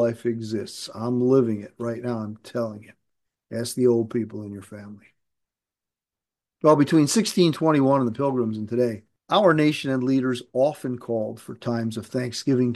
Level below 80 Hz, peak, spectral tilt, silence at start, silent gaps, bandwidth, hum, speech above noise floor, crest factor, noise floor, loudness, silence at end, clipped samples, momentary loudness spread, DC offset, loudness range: -70 dBFS; -4 dBFS; -6 dB/octave; 0 s; none; 12.5 kHz; none; 67 dB; 18 dB; -90 dBFS; -23 LUFS; 0 s; under 0.1%; 14 LU; under 0.1%; 8 LU